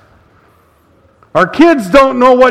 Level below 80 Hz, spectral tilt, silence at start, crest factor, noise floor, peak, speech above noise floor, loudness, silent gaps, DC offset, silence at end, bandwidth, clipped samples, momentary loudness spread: -40 dBFS; -5.5 dB/octave; 1.35 s; 10 dB; -49 dBFS; 0 dBFS; 42 dB; -9 LUFS; none; under 0.1%; 0 s; 14 kHz; 1%; 6 LU